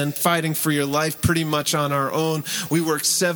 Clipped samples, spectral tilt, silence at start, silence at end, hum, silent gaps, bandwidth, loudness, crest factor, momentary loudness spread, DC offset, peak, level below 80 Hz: under 0.1%; -4 dB/octave; 0 s; 0 s; none; none; over 20 kHz; -21 LUFS; 16 dB; 3 LU; under 0.1%; -4 dBFS; -46 dBFS